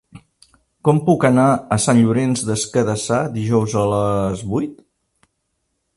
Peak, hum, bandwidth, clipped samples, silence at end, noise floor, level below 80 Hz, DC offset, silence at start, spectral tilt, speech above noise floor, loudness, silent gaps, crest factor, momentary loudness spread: -2 dBFS; none; 11.5 kHz; under 0.1%; 1.25 s; -72 dBFS; -48 dBFS; under 0.1%; 0.15 s; -6 dB/octave; 55 dB; -17 LUFS; none; 18 dB; 7 LU